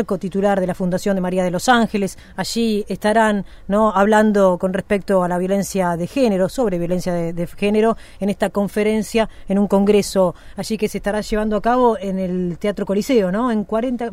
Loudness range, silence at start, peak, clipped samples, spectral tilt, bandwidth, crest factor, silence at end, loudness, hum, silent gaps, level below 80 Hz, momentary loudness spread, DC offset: 3 LU; 0 s; -2 dBFS; under 0.1%; -6 dB/octave; 15.5 kHz; 16 dB; 0 s; -19 LUFS; none; none; -40 dBFS; 7 LU; under 0.1%